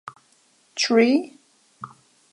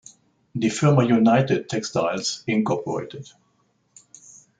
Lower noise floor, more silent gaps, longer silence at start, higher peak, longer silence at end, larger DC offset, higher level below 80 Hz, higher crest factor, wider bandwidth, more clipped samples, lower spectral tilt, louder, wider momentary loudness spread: second, -61 dBFS vs -66 dBFS; neither; first, 0.75 s vs 0.55 s; about the same, -6 dBFS vs -4 dBFS; second, 0.45 s vs 1.35 s; neither; second, -78 dBFS vs -64 dBFS; about the same, 20 dB vs 18 dB; first, 11 kHz vs 9.4 kHz; neither; second, -3.5 dB/octave vs -6 dB/octave; about the same, -20 LUFS vs -21 LUFS; first, 24 LU vs 14 LU